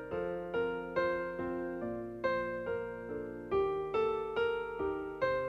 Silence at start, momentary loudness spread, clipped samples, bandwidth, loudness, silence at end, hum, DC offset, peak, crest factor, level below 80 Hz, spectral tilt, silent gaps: 0 s; 6 LU; under 0.1%; 7.4 kHz; -36 LUFS; 0 s; none; under 0.1%; -20 dBFS; 16 dB; -60 dBFS; -7 dB/octave; none